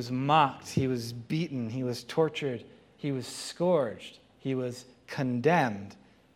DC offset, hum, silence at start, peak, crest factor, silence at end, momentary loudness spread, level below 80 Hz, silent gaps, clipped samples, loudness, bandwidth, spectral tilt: under 0.1%; none; 0 s; -10 dBFS; 22 dB; 0.4 s; 15 LU; -70 dBFS; none; under 0.1%; -30 LUFS; 16 kHz; -6 dB/octave